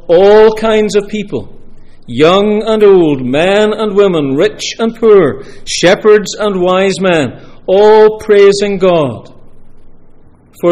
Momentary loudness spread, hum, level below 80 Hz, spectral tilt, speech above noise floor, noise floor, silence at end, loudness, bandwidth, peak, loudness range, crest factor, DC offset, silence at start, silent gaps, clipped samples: 12 LU; none; -36 dBFS; -5 dB/octave; 29 dB; -38 dBFS; 0 s; -9 LUFS; 11.5 kHz; 0 dBFS; 2 LU; 10 dB; under 0.1%; 0.05 s; none; 0.4%